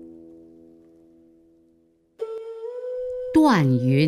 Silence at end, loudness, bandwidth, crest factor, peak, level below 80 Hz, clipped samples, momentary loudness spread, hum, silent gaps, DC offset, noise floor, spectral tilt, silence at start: 0 s; -22 LUFS; 13 kHz; 18 dB; -6 dBFS; -58 dBFS; under 0.1%; 17 LU; none; none; under 0.1%; -62 dBFS; -7.5 dB/octave; 0 s